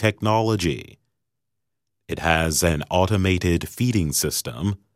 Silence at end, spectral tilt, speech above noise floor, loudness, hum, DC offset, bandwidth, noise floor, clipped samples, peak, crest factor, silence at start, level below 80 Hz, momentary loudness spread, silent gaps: 0.2 s; -4.5 dB/octave; 62 dB; -22 LUFS; none; under 0.1%; 16 kHz; -83 dBFS; under 0.1%; -4 dBFS; 18 dB; 0 s; -40 dBFS; 7 LU; none